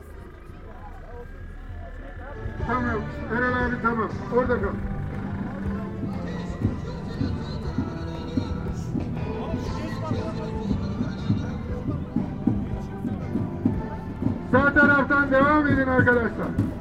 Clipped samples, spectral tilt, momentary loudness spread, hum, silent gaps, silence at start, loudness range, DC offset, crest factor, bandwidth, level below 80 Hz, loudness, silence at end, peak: under 0.1%; -8 dB/octave; 20 LU; none; none; 0 s; 9 LU; under 0.1%; 20 dB; 10 kHz; -38 dBFS; -25 LUFS; 0 s; -6 dBFS